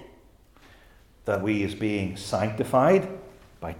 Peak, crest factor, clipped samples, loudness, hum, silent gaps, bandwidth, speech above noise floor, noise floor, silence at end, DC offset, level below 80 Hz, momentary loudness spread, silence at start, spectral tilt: -8 dBFS; 20 dB; under 0.1%; -25 LUFS; none; none; 16.5 kHz; 31 dB; -55 dBFS; 0 s; under 0.1%; -56 dBFS; 17 LU; 0 s; -6.5 dB/octave